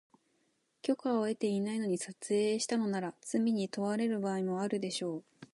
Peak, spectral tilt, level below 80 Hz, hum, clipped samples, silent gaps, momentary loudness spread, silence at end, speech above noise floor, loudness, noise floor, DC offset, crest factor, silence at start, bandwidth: -18 dBFS; -5 dB/octave; -82 dBFS; none; under 0.1%; none; 6 LU; 0.1 s; 43 dB; -34 LUFS; -76 dBFS; under 0.1%; 16 dB; 0.85 s; 11.5 kHz